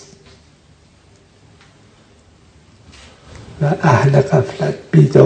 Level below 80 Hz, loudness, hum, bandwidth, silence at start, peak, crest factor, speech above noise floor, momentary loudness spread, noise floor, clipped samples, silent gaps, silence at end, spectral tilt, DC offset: -48 dBFS; -14 LUFS; none; 9 kHz; 3.55 s; 0 dBFS; 18 dB; 37 dB; 10 LU; -49 dBFS; under 0.1%; none; 0 s; -8 dB/octave; under 0.1%